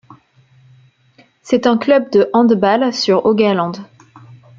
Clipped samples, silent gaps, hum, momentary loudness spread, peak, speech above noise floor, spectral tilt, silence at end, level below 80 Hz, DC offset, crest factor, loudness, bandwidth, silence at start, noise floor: under 0.1%; none; none; 7 LU; -2 dBFS; 39 dB; -6 dB/octave; 0.75 s; -60 dBFS; under 0.1%; 14 dB; -14 LUFS; 7.6 kHz; 1.45 s; -52 dBFS